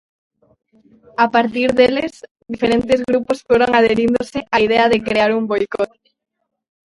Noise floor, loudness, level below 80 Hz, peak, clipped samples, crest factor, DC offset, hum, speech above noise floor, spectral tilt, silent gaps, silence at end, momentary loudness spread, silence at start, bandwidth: -49 dBFS; -16 LUFS; -48 dBFS; 0 dBFS; under 0.1%; 18 dB; under 0.1%; none; 34 dB; -5.5 dB/octave; 2.31-2.35 s; 1 s; 9 LU; 1.2 s; 11.5 kHz